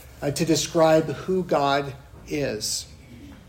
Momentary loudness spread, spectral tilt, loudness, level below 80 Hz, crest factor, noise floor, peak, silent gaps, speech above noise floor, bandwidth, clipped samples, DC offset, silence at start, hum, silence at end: 14 LU; -4.5 dB/octave; -23 LUFS; -50 dBFS; 16 dB; -44 dBFS; -8 dBFS; none; 21 dB; 16 kHz; under 0.1%; under 0.1%; 0 s; none; 0.1 s